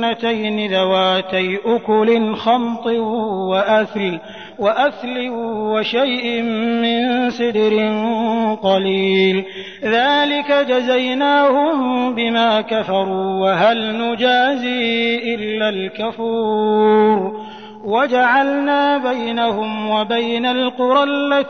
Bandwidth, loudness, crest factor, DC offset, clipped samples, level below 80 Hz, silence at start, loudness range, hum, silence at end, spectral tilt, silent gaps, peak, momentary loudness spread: 6.6 kHz; -17 LUFS; 14 dB; 0.3%; under 0.1%; -62 dBFS; 0 s; 3 LU; none; 0 s; -6 dB/octave; none; -4 dBFS; 7 LU